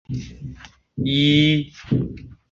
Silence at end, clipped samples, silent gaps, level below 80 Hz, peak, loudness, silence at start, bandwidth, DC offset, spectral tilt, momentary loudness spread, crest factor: 0.2 s; under 0.1%; none; -44 dBFS; -4 dBFS; -20 LUFS; 0.1 s; 7.6 kHz; under 0.1%; -6.5 dB/octave; 22 LU; 18 dB